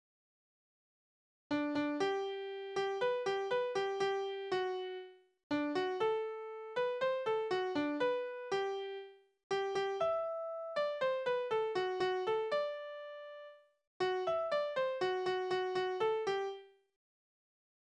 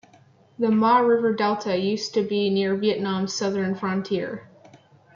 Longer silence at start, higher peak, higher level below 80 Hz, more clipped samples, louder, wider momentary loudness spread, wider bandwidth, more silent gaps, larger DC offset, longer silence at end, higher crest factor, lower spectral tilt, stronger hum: first, 1.5 s vs 0.6 s; second, -22 dBFS vs -8 dBFS; second, -80 dBFS vs -70 dBFS; neither; second, -37 LUFS vs -23 LUFS; about the same, 10 LU vs 9 LU; first, 9.4 kHz vs 7.4 kHz; first, 5.43-5.50 s, 9.43-9.50 s, 13.87-14.00 s vs none; neither; first, 1.3 s vs 0.4 s; about the same, 14 dB vs 16 dB; about the same, -4.5 dB/octave vs -5.5 dB/octave; neither